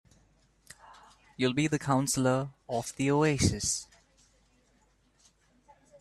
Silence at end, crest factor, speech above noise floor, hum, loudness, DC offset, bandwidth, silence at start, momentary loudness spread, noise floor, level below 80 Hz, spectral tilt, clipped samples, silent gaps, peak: 2.15 s; 20 dB; 39 dB; none; -29 LUFS; under 0.1%; 13 kHz; 0.9 s; 11 LU; -68 dBFS; -56 dBFS; -4.5 dB/octave; under 0.1%; none; -12 dBFS